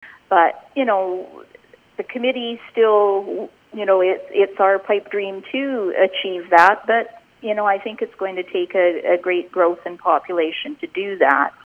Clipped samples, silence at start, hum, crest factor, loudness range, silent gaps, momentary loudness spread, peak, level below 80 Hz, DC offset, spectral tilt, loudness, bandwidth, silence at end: under 0.1%; 0 s; none; 20 dB; 3 LU; none; 12 LU; 0 dBFS; -70 dBFS; under 0.1%; -5 dB/octave; -19 LUFS; 8 kHz; 0.15 s